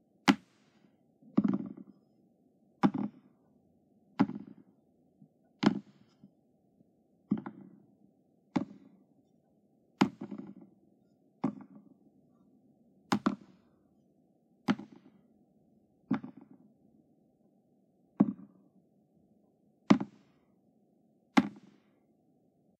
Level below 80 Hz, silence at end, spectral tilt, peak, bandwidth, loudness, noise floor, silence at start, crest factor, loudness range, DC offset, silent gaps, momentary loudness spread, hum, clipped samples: -78 dBFS; 1.3 s; -6 dB/octave; -8 dBFS; 11 kHz; -34 LUFS; -70 dBFS; 0.25 s; 30 dB; 7 LU; under 0.1%; none; 23 LU; none; under 0.1%